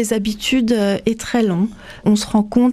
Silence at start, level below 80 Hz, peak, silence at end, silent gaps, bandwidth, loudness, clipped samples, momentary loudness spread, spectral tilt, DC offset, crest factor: 0 s; -44 dBFS; -2 dBFS; 0 s; none; 14.5 kHz; -18 LUFS; under 0.1%; 5 LU; -5 dB/octave; under 0.1%; 14 dB